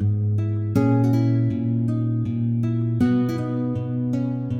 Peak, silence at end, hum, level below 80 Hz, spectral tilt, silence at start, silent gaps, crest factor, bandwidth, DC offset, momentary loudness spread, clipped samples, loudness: -6 dBFS; 0 s; none; -52 dBFS; -10 dB/octave; 0 s; none; 14 dB; 6.6 kHz; under 0.1%; 6 LU; under 0.1%; -22 LUFS